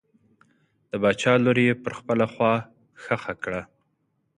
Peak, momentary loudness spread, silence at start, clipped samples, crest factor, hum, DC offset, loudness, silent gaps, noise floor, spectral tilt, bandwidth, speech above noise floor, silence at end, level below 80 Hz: -6 dBFS; 13 LU; 0.95 s; under 0.1%; 18 dB; none; under 0.1%; -24 LUFS; none; -72 dBFS; -6 dB/octave; 10.5 kHz; 49 dB; 0.75 s; -60 dBFS